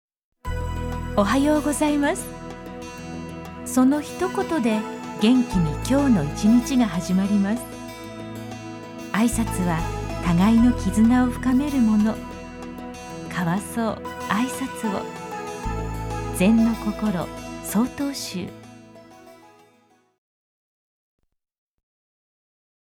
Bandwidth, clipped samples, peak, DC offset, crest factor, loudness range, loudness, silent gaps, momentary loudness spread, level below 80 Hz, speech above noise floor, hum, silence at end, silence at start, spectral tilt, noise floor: 17.5 kHz; under 0.1%; -6 dBFS; under 0.1%; 18 dB; 7 LU; -22 LUFS; none; 17 LU; -38 dBFS; 39 dB; none; 3.45 s; 0.45 s; -6 dB/octave; -60 dBFS